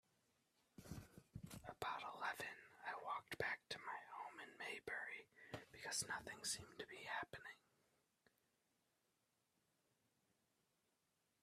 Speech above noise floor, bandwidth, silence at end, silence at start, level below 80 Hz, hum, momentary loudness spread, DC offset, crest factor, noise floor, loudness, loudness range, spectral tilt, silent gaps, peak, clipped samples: 36 dB; 15 kHz; 3.85 s; 0.8 s; -78 dBFS; none; 12 LU; under 0.1%; 24 dB; -87 dBFS; -50 LUFS; 8 LU; -2 dB/octave; none; -30 dBFS; under 0.1%